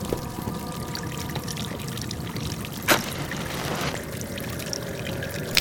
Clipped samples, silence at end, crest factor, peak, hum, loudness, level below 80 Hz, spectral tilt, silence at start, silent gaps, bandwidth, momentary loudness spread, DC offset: under 0.1%; 0 s; 28 dB; 0 dBFS; none; -29 LUFS; -46 dBFS; -3.5 dB/octave; 0 s; none; 18 kHz; 9 LU; under 0.1%